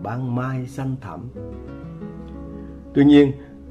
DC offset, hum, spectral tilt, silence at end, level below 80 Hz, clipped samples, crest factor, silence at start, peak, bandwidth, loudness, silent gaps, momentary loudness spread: under 0.1%; none; -8.5 dB/octave; 0 s; -44 dBFS; under 0.1%; 18 dB; 0 s; -4 dBFS; 7 kHz; -19 LUFS; none; 22 LU